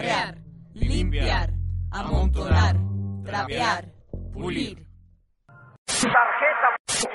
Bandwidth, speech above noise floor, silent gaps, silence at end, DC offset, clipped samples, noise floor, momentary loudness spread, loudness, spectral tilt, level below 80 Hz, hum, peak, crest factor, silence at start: 11.5 kHz; 35 dB; 5.78-5.86 s, 6.80-6.85 s; 0 s; under 0.1%; under 0.1%; -57 dBFS; 14 LU; -24 LUFS; -4 dB/octave; -32 dBFS; none; -6 dBFS; 18 dB; 0 s